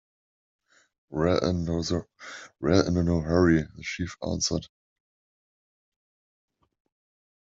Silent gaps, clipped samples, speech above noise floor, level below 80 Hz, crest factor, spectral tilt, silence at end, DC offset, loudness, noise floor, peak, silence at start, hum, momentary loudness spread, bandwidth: none; under 0.1%; over 64 dB; -50 dBFS; 22 dB; -5.5 dB/octave; 2.8 s; under 0.1%; -26 LUFS; under -90 dBFS; -6 dBFS; 1.1 s; none; 13 LU; 7.8 kHz